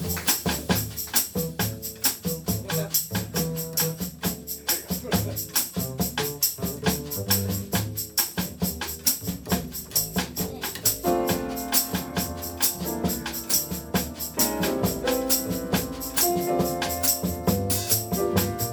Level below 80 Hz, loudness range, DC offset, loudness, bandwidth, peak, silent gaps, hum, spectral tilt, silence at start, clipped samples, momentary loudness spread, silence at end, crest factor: -44 dBFS; 2 LU; under 0.1%; -25 LUFS; over 20 kHz; -6 dBFS; none; none; -3.5 dB/octave; 0 s; under 0.1%; 6 LU; 0 s; 20 dB